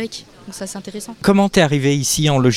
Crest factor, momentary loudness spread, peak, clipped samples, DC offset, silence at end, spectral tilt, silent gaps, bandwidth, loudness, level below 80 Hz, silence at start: 18 dB; 17 LU; 0 dBFS; under 0.1%; under 0.1%; 0 s; -5 dB/octave; none; 16.5 kHz; -15 LUFS; -44 dBFS; 0 s